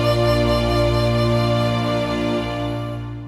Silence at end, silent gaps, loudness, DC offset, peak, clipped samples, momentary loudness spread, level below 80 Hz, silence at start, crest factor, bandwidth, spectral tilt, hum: 0 s; none; -20 LUFS; under 0.1%; -6 dBFS; under 0.1%; 7 LU; -32 dBFS; 0 s; 12 dB; 14 kHz; -6.5 dB/octave; 60 Hz at -50 dBFS